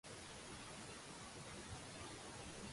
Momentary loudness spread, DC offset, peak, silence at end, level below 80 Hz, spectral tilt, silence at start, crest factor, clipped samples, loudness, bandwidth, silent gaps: 1 LU; under 0.1%; -40 dBFS; 0 s; -66 dBFS; -3 dB/octave; 0.05 s; 14 dB; under 0.1%; -53 LUFS; 11.5 kHz; none